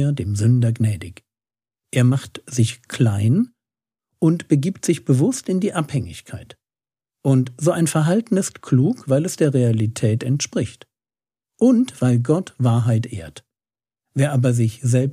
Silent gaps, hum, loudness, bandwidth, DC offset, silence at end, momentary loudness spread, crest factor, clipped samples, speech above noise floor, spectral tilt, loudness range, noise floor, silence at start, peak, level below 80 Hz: none; none; -20 LUFS; 14 kHz; under 0.1%; 0 s; 10 LU; 16 dB; under 0.1%; over 72 dB; -6.5 dB/octave; 2 LU; under -90 dBFS; 0 s; -4 dBFS; -56 dBFS